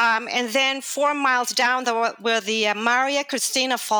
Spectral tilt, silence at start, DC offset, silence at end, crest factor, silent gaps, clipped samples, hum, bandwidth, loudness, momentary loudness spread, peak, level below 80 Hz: -0.5 dB/octave; 0 s; under 0.1%; 0 s; 14 dB; none; under 0.1%; none; over 20 kHz; -21 LUFS; 3 LU; -8 dBFS; -76 dBFS